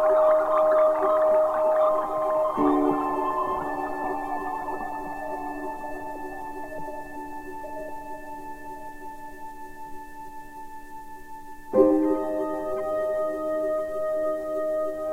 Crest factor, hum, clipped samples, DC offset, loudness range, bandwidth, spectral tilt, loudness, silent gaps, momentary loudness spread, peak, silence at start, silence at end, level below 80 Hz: 20 dB; none; under 0.1%; under 0.1%; 17 LU; 16 kHz; -6.5 dB/octave; -25 LUFS; none; 21 LU; -6 dBFS; 0 s; 0 s; -52 dBFS